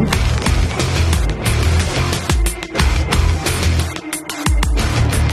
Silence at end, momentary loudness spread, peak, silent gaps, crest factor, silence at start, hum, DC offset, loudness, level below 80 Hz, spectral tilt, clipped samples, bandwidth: 0 s; 4 LU; 0 dBFS; none; 16 dB; 0 s; none; under 0.1%; -17 LUFS; -20 dBFS; -4.5 dB/octave; under 0.1%; 13.5 kHz